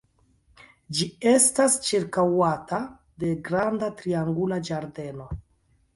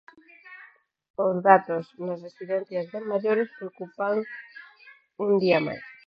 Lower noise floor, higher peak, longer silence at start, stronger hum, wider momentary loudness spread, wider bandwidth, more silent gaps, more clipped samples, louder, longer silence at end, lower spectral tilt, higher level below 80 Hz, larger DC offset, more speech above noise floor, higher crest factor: first, -65 dBFS vs -54 dBFS; second, -8 dBFS vs -2 dBFS; first, 0.9 s vs 0.45 s; neither; second, 18 LU vs 26 LU; first, 12 kHz vs 6 kHz; second, none vs 1.10-1.14 s; neither; about the same, -24 LUFS vs -25 LUFS; first, 0.55 s vs 0.15 s; second, -4 dB/octave vs -8.5 dB/octave; first, -52 dBFS vs -74 dBFS; neither; first, 41 dB vs 29 dB; second, 18 dB vs 24 dB